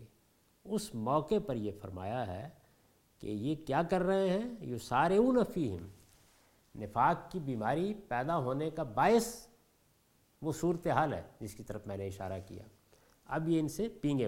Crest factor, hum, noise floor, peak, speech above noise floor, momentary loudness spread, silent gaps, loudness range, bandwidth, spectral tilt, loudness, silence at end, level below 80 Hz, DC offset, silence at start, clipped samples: 20 dB; none; -70 dBFS; -14 dBFS; 37 dB; 16 LU; none; 5 LU; 16.5 kHz; -6.5 dB/octave; -34 LUFS; 0 s; -60 dBFS; under 0.1%; 0 s; under 0.1%